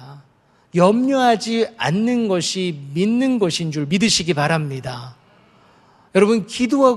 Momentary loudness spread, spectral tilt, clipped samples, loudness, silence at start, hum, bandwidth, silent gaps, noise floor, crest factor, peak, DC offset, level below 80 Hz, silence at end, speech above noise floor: 8 LU; -5 dB/octave; under 0.1%; -18 LUFS; 0 s; none; 12.5 kHz; none; -56 dBFS; 18 dB; 0 dBFS; under 0.1%; -56 dBFS; 0 s; 39 dB